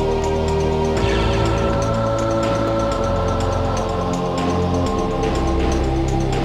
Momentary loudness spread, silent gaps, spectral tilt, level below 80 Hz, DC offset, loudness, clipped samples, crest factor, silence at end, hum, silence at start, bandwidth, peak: 2 LU; none; -6.5 dB/octave; -26 dBFS; under 0.1%; -20 LUFS; under 0.1%; 12 dB; 0 s; none; 0 s; 13.5 kHz; -6 dBFS